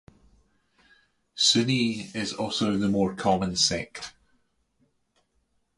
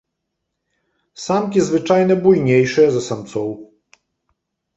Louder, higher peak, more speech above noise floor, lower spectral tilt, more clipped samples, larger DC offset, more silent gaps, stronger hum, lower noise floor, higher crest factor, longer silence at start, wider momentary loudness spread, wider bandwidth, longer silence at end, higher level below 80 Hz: second, -24 LUFS vs -16 LUFS; second, -8 dBFS vs -2 dBFS; second, 46 dB vs 61 dB; second, -3.5 dB/octave vs -6.5 dB/octave; neither; neither; neither; neither; second, -72 dBFS vs -77 dBFS; about the same, 20 dB vs 16 dB; first, 1.35 s vs 1.2 s; first, 17 LU vs 13 LU; first, 11.5 kHz vs 8 kHz; first, 1.65 s vs 1.1 s; about the same, -56 dBFS vs -58 dBFS